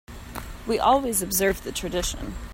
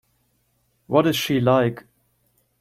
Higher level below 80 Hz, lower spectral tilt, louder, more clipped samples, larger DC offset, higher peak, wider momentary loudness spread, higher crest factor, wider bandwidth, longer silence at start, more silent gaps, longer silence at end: first, -40 dBFS vs -60 dBFS; second, -3 dB/octave vs -5.5 dB/octave; second, -24 LUFS vs -20 LUFS; neither; neither; second, -6 dBFS vs -2 dBFS; first, 17 LU vs 7 LU; about the same, 20 dB vs 20 dB; about the same, 16.5 kHz vs 16.5 kHz; second, 0.1 s vs 0.9 s; neither; second, 0 s vs 0.8 s